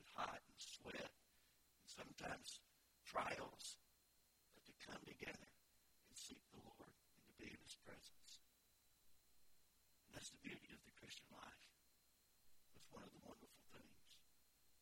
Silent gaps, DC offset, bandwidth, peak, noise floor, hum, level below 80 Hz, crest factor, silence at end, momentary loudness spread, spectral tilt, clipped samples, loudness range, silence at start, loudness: none; under 0.1%; 16.5 kHz; -30 dBFS; -79 dBFS; none; -80 dBFS; 28 dB; 0 s; 15 LU; -2.5 dB/octave; under 0.1%; 11 LU; 0 s; -56 LUFS